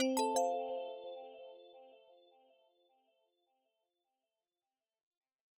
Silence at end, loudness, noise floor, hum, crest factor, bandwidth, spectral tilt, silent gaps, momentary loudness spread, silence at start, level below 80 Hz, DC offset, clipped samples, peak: 3.6 s; -38 LUFS; under -90 dBFS; none; 20 dB; 10 kHz; -1.5 dB/octave; none; 25 LU; 0 s; under -90 dBFS; under 0.1%; under 0.1%; -22 dBFS